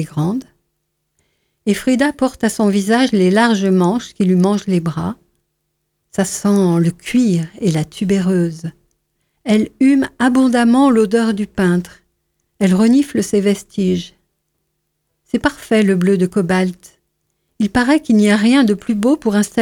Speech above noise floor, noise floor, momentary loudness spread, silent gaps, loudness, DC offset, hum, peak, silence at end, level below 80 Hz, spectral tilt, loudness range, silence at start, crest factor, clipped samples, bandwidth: 56 dB; -71 dBFS; 9 LU; none; -15 LUFS; under 0.1%; none; 0 dBFS; 0 s; -48 dBFS; -6 dB/octave; 3 LU; 0 s; 16 dB; under 0.1%; 16.5 kHz